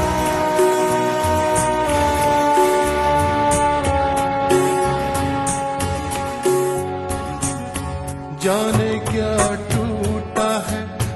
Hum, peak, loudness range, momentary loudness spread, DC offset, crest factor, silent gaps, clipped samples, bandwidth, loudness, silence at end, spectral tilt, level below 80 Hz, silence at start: none; -2 dBFS; 5 LU; 7 LU; under 0.1%; 16 dB; none; under 0.1%; 12.5 kHz; -19 LUFS; 0 s; -5 dB/octave; -36 dBFS; 0 s